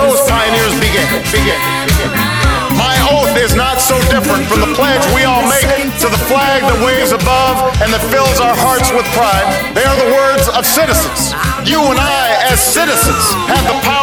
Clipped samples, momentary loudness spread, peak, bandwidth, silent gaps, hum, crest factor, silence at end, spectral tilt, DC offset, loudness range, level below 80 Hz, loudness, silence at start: under 0.1%; 3 LU; 0 dBFS; over 20 kHz; none; none; 10 dB; 0 s; -3.5 dB/octave; 0.2%; 1 LU; -22 dBFS; -10 LUFS; 0 s